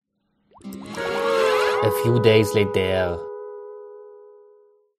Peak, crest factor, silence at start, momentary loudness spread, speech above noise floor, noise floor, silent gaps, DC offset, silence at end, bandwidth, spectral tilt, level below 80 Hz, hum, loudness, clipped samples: -4 dBFS; 20 dB; 0.65 s; 22 LU; 48 dB; -67 dBFS; none; under 0.1%; 0.8 s; 15.5 kHz; -5.5 dB/octave; -54 dBFS; none; -20 LUFS; under 0.1%